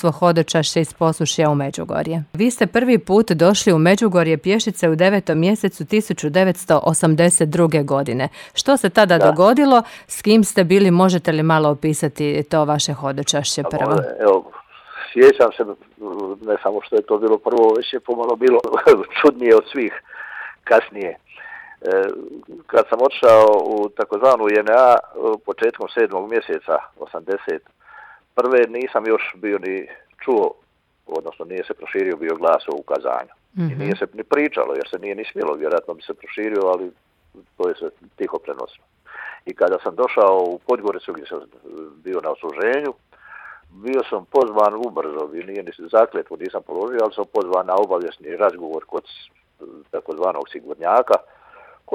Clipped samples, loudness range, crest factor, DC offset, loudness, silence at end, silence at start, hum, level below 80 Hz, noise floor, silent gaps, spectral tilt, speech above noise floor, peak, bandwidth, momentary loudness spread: under 0.1%; 9 LU; 16 dB; under 0.1%; -18 LUFS; 0.75 s; 0.05 s; none; -58 dBFS; -46 dBFS; none; -5 dB/octave; 29 dB; -2 dBFS; 17 kHz; 17 LU